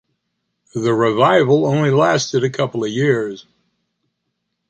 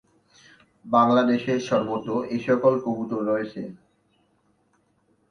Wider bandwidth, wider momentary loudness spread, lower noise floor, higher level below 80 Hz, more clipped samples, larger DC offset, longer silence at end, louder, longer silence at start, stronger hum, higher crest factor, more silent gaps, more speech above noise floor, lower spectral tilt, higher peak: first, 9.2 kHz vs 6.8 kHz; about the same, 10 LU vs 9 LU; first, -74 dBFS vs -67 dBFS; about the same, -62 dBFS vs -66 dBFS; neither; neither; second, 1.3 s vs 1.55 s; first, -16 LUFS vs -23 LUFS; about the same, 0.75 s vs 0.85 s; neither; about the same, 16 dB vs 20 dB; neither; first, 58 dB vs 44 dB; about the same, -6 dB/octave vs -6.5 dB/octave; first, -2 dBFS vs -6 dBFS